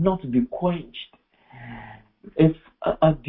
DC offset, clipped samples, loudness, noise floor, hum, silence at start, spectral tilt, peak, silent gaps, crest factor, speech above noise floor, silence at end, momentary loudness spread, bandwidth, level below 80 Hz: under 0.1%; under 0.1%; -23 LUFS; -47 dBFS; none; 0 s; -12.5 dB/octave; -4 dBFS; none; 20 dB; 25 dB; 0 s; 21 LU; 4 kHz; -48 dBFS